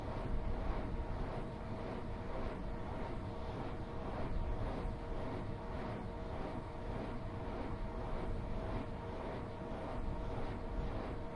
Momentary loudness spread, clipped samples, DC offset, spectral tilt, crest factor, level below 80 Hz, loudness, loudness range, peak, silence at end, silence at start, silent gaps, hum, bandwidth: 3 LU; under 0.1%; under 0.1%; -8 dB/octave; 16 dB; -44 dBFS; -44 LUFS; 1 LU; -24 dBFS; 0 s; 0 s; none; none; 10.5 kHz